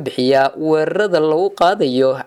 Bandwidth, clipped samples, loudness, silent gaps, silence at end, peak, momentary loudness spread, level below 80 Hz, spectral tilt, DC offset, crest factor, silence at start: 13 kHz; under 0.1%; -15 LUFS; none; 0.05 s; -4 dBFS; 2 LU; -60 dBFS; -6 dB/octave; under 0.1%; 12 dB; 0 s